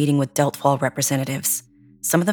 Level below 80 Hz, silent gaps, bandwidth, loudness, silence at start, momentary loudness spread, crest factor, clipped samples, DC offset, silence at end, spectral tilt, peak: -66 dBFS; none; over 20 kHz; -21 LUFS; 0 s; 4 LU; 18 dB; under 0.1%; under 0.1%; 0 s; -4.5 dB/octave; -2 dBFS